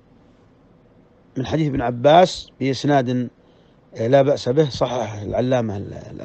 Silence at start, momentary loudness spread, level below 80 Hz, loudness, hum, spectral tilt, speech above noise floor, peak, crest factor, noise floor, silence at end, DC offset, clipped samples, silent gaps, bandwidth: 1.35 s; 14 LU; -48 dBFS; -19 LUFS; none; -6.5 dB/octave; 34 dB; 0 dBFS; 20 dB; -52 dBFS; 0 s; under 0.1%; under 0.1%; none; 8.6 kHz